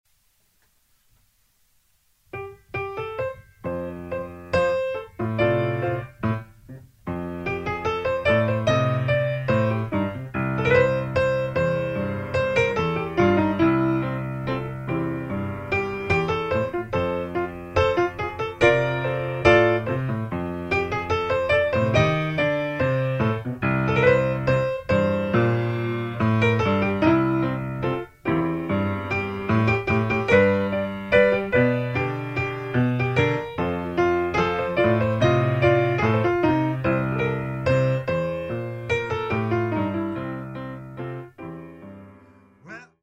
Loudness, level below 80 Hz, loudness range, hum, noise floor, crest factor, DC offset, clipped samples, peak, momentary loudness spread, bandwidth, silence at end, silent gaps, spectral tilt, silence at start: -23 LUFS; -46 dBFS; 6 LU; none; -65 dBFS; 20 dB; under 0.1%; under 0.1%; -2 dBFS; 12 LU; 8.6 kHz; 0.2 s; none; -7.5 dB/octave; 2.35 s